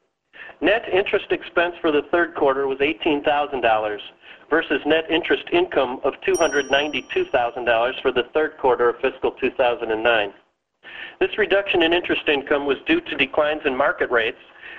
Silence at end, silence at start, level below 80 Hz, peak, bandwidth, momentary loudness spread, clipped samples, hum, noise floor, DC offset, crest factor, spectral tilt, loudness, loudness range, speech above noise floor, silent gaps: 0 s; 0.4 s; -52 dBFS; -4 dBFS; 9 kHz; 5 LU; under 0.1%; none; -46 dBFS; under 0.1%; 18 dB; -4 dB/octave; -21 LUFS; 1 LU; 26 dB; none